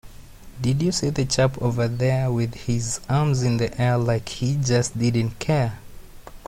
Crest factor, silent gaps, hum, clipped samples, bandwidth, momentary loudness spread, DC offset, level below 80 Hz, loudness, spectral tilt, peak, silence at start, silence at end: 16 dB; none; none; under 0.1%; 15 kHz; 5 LU; under 0.1%; -44 dBFS; -23 LUFS; -5.5 dB/octave; -8 dBFS; 0.05 s; 0 s